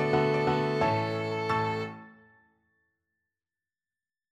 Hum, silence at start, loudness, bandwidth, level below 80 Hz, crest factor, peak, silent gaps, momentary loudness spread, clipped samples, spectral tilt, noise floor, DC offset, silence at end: none; 0 s; -28 LUFS; 12 kHz; -60 dBFS; 18 dB; -14 dBFS; none; 10 LU; under 0.1%; -7 dB/octave; under -90 dBFS; under 0.1%; 2.2 s